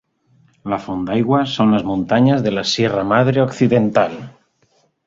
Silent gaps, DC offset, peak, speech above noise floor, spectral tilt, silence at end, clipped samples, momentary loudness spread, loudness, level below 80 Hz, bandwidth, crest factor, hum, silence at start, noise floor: none; under 0.1%; -2 dBFS; 45 dB; -6.5 dB/octave; 0.75 s; under 0.1%; 9 LU; -17 LUFS; -50 dBFS; 7.8 kHz; 16 dB; none; 0.65 s; -60 dBFS